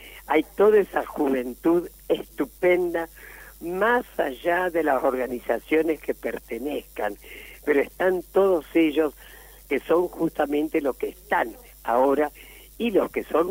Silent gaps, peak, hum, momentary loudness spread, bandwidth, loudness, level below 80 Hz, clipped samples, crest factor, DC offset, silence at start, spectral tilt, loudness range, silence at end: none; -8 dBFS; none; 10 LU; 16 kHz; -24 LUFS; -52 dBFS; under 0.1%; 16 dB; under 0.1%; 0 s; -5.5 dB/octave; 2 LU; 0 s